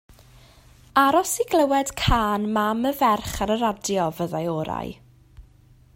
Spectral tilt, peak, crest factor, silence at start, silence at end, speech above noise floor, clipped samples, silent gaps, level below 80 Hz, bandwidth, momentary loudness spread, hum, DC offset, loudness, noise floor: -4.5 dB/octave; -4 dBFS; 20 dB; 0.95 s; 0.55 s; 31 dB; under 0.1%; none; -40 dBFS; 16.5 kHz; 8 LU; none; under 0.1%; -22 LUFS; -53 dBFS